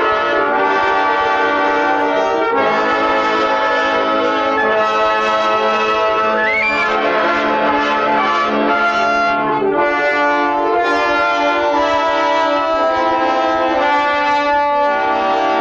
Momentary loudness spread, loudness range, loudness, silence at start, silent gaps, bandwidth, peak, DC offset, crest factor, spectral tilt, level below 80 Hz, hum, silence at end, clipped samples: 1 LU; 0 LU; -14 LUFS; 0 s; none; 8 kHz; -4 dBFS; under 0.1%; 12 dB; -4 dB/octave; -48 dBFS; none; 0 s; under 0.1%